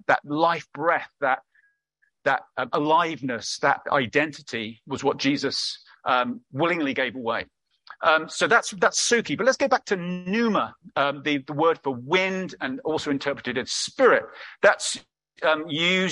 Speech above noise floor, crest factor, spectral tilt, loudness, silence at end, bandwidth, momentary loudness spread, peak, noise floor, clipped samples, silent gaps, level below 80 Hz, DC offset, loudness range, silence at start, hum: 47 dB; 20 dB; -3.5 dB/octave; -24 LUFS; 0 s; 11.5 kHz; 9 LU; -4 dBFS; -71 dBFS; under 0.1%; none; -66 dBFS; under 0.1%; 3 LU; 0.1 s; none